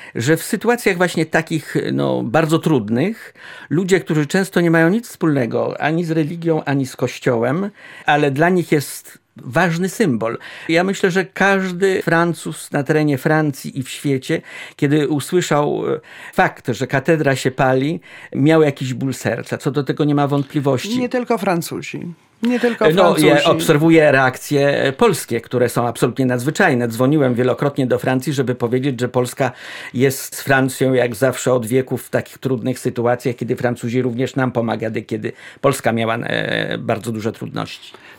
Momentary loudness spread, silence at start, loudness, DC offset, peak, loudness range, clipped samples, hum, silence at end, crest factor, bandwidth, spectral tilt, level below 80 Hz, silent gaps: 9 LU; 0 s; -18 LUFS; under 0.1%; -2 dBFS; 5 LU; under 0.1%; none; 0.05 s; 16 dB; 17 kHz; -5.5 dB/octave; -56 dBFS; none